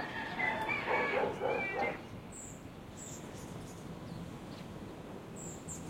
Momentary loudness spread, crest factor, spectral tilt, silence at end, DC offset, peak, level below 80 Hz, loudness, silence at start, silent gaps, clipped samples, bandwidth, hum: 14 LU; 18 dB; -4 dB/octave; 0 s; under 0.1%; -20 dBFS; -62 dBFS; -38 LUFS; 0 s; none; under 0.1%; 16.5 kHz; none